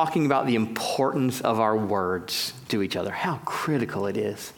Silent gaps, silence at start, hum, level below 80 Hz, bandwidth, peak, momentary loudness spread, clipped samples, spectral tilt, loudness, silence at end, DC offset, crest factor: none; 0 s; none; -68 dBFS; 18 kHz; -6 dBFS; 5 LU; under 0.1%; -5 dB/octave; -26 LUFS; 0.05 s; under 0.1%; 20 dB